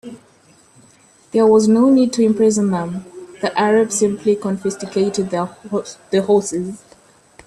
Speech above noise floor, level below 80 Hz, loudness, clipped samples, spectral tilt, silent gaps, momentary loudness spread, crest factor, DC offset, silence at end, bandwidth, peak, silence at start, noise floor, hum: 35 dB; -58 dBFS; -17 LUFS; under 0.1%; -5.5 dB/octave; none; 13 LU; 14 dB; under 0.1%; 0.7 s; 12.5 kHz; -4 dBFS; 0.05 s; -51 dBFS; none